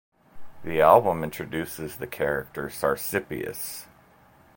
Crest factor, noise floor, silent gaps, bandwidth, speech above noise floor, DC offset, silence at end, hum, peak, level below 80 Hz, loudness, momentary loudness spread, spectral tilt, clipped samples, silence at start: 24 dB; -56 dBFS; none; 17 kHz; 31 dB; under 0.1%; 0.7 s; none; -2 dBFS; -54 dBFS; -25 LUFS; 17 LU; -5 dB/octave; under 0.1%; 0.35 s